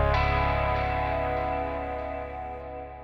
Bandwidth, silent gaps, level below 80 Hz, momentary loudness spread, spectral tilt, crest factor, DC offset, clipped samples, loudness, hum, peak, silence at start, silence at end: 6 kHz; none; -34 dBFS; 12 LU; -7.5 dB/octave; 16 dB; under 0.1%; under 0.1%; -28 LUFS; none; -12 dBFS; 0 s; 0 s